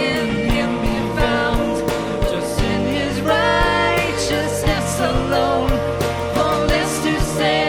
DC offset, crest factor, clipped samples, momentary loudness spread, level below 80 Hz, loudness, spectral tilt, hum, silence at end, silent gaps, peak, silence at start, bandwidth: under 0.1%; 16 dB; under 0.1%; 5 LU; -28 dBFS; -19 LUFS; -4.5 dB/octave; none; 0 s; none; -4 dBFS; 0 s; 18 kHz